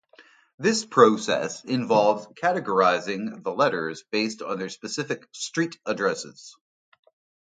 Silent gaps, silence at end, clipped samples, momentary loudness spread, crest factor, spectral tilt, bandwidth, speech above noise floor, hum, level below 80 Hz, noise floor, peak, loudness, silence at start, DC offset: 0.54-0.58 s; 0.95 s; under 0.1%; 13 LU; 22 dB; -4 dB/octave; 9.4 kHz; 31 dB; none; -74 dBFS; -55 dBFS; -2 dBFS; -24 LUFS; 0.2 s; under 0.1%